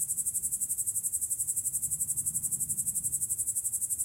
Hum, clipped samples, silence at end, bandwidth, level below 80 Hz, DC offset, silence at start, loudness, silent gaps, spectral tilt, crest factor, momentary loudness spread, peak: none; under 0.1%; 0 s; 16 kHz; -62 dBFS; under 0.1%; 0 s; -29 LUFS; none; -1.5 dB/octave; 18 dB; 1 LU; -14 dBFS